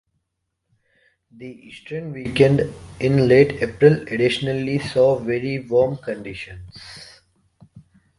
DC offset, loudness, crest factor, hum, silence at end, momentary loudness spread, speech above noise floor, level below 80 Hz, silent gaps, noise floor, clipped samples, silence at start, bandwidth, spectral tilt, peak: under 0.1%; -19 LUFS; 20 dB; none; 0.4 s; 23 LU; 57 dB; -50 dBFS; none; -77 dBFS; under 0.1%; 1.4 s; 11.5 kHz; -7 dB/octave; 0 dBFS